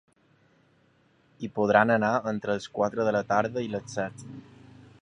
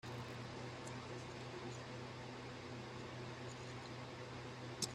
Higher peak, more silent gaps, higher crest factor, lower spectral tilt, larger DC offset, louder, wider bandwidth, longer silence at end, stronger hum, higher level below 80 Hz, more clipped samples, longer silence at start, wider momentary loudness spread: first, -4 dBFS vs -24 dBFS; neither; about the same, 24 dB vs 24 dB; first, -6 dB/octave vs -4 dB/octave; neither; first, -27 LUFS vs -49 LUFS; second, 10.5 kHz vs 15 kHz; first, 0.6 s vs 0 s; neither; first, -64 dBFS vs -70 dBFS; neither; first, 1.4 s vs 0.05 s; first, 18 LU vs 1 LU